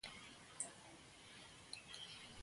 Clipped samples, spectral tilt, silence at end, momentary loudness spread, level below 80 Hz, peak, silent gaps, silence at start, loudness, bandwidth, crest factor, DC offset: under 0.1%; -1 dB/octave; 0 s; 10 LU; -76 dBFS; -28 dBFS; none; 0.05 s; -53 LUFS; 11.5 kHz; 28 dB; under 0.1%